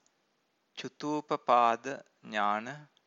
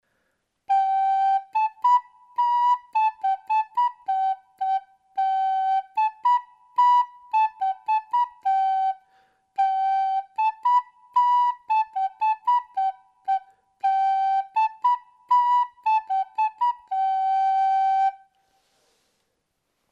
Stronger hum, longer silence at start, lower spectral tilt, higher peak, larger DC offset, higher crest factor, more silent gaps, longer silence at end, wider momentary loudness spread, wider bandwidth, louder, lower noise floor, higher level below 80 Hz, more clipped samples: neither; about the same, 0.75 s vs 0.7 s; first, -4.5 dB/octave vs 1 dB/octave; about the same, -10 dBFS vs -12 dBFS; neither; first, 22 dB vs 12 dB; neither; second, 0.2 s vs 1.75 s; first, 19 LU vs 7 LU; about the same, 7.8 kHz vs 7.4 kHz; second, -30 LUFS vs -23 LUFS; about the same, -76 dBFS vs -76 dBFS; about the same, -84 dBFS vs -84 dBFS; neither